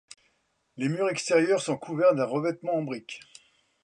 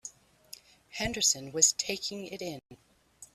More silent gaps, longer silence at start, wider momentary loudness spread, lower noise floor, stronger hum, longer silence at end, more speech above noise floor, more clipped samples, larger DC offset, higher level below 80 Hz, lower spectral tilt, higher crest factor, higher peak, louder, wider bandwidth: neither; first, 0.75 s vs 0.05 s; second, 13 LU vs 26 LU; first, -72 dBFS vs -54 dBFS; neither; first, 0.65 s vs 0.1 s; first, 46 dB vs 23 dB; neither; neither; second, -76 dBFS vs -58 dBFS; first, -5 dB/octave vs -1 dB/octave; second, 18 dB vs 26 dB; about the same, -10 dBFS vs -8 dBFS; about the same, -27 LUFS vs -28 LUFS; second, 11 kHz vs 15.5 kHz